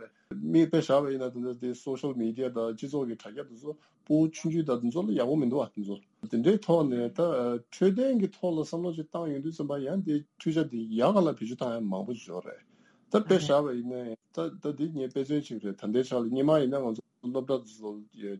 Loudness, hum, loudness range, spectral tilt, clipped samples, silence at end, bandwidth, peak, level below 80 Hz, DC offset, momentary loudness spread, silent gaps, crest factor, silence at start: -30 LUFS; none; 3 LU; -7 dB/octave; under 0.1%; 0 s; 11.5 kHz; -10 dBFS; -76 dBFS; under 0.1%; 14 LU; none; 20 dB; 0 s